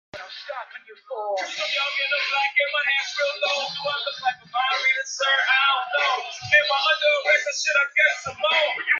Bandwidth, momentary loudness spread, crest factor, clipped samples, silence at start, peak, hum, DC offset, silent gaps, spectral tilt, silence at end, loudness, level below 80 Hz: 7.8 kHz; 12 LU; 18 dB; under 0.1%; 0.15 s; -6 dBFS; none; under 0.1%; none; 0.5 dB/octave; 0 s; -21 LUFS; -72 dBFS